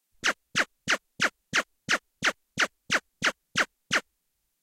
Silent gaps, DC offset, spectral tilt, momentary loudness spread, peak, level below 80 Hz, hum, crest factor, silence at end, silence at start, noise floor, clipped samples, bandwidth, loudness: none; under 0.1%; -1 dB/octave; 3 LU; -12 dBFS; -66 dBFS; none; 18 dB; 0.6 s; 0.25 s; -77 dBFS; under 0.1%; 16 kHz; -28 LUFS